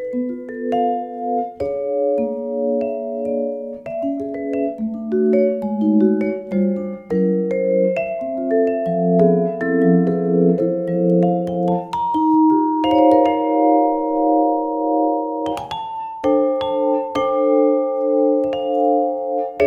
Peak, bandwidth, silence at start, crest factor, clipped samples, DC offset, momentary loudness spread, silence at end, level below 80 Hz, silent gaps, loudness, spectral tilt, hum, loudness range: -2 dBFS; 7 kHz; 0 s; 16 dB; under 0.1%; under 0.1%; 9 LU; 0 s; -56 dBFS; none; -19 LUFS; -9 dB/octave; none; 6 LU